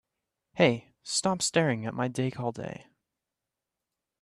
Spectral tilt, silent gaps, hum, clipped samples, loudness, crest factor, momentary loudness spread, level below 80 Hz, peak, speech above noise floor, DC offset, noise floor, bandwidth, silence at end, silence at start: -4 dB/octave; none; none; under 0.1%; -28 LUFS; 24 dB; 15 LU; -68 dBFS; -6 dBFS; 60 dB; under 0.1%; -88 dBFS; 13.5 kHz; 1.4 s; 0.55 s